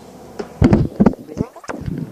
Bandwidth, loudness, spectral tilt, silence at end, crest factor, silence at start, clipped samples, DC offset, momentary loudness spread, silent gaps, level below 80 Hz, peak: 10 kHz; -18 LUFS; -8.5 dB/octave; 0 s; 18 dB; 0.1 s; under 0.1%; under 0.1%; 18 LU; none; -30 dBFS; 0 dBFS